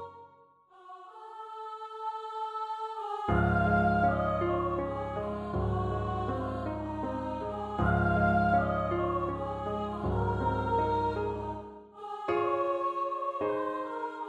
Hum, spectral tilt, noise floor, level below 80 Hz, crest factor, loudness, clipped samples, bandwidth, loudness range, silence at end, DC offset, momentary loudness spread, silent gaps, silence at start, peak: none; -8.5 dB/octave; -60 dBFS; -44 dBFS; 16 dB; -31 LUFS; under 0.1%; 8.4 kHz; 4 LU; 0 s; under 0.1%; 15 LU; none; 0 s; -14 dBFS